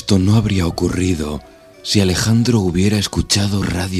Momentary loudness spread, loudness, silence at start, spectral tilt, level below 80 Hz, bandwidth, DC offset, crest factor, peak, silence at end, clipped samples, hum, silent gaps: 7 LU; -16 LUFS; 0 s; -5 dB/octave; -36 dBFS; 14 kHz; under 0.1%; 16 dB; 0 dBFS; 0 s; under 0.1%; none; none